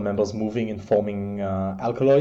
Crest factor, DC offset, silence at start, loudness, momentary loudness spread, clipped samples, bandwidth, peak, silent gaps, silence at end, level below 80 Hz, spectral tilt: 14 dB; under 0.1%; 0 s; -25 LUFS; 6 LU; under 0.1%; 7.6 kHz; -8 dBFS; none; 0 s; -54 dBFS; -8 dB/octave